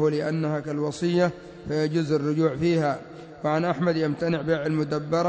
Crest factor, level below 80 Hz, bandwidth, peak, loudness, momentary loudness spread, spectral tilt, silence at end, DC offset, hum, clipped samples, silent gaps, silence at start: 16 dB; -56 dBFS; 8 kHz; -10 dBFS; -25 LUFS; 6 LU; -7 dB/octave; 0 s; under 0.1%; none; under 0.1%; none; 0 s